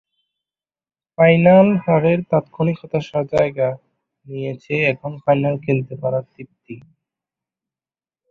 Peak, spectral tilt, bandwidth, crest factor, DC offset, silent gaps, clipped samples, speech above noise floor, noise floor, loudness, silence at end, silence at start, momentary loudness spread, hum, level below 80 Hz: -2 dBFS; -9 dB/octave; 6.8 kHz; 18 dB; under 0.1%; none; under 0.1%; over 73 dB; under -90 dBFS; -18 LUFS; 1.5 s; 1.2 s; 19 LU; none; -56 dBFS